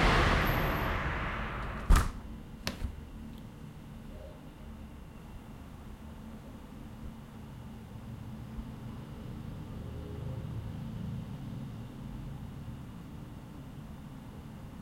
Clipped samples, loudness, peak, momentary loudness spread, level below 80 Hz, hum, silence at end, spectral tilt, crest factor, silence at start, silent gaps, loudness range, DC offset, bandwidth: under 0.1%; -38 LUFS; -10 dBFS; 18 LU; -40 dBFS; none; 0 s; -5.5 dB/octave; 24 dB; 0 s; none; 13 LU; under 0.1%; 16 kHz